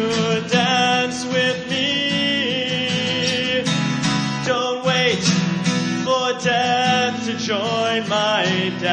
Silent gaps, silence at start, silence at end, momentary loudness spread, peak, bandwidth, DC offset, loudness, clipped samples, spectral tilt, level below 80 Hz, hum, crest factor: none; 0 s; 0 s; 4 LU; -4 dBFS; 10 kHz; under 0.1%; -19 LUFS; under 0.1%; -4 dB/octave; -56 dBFS; none; 16 dB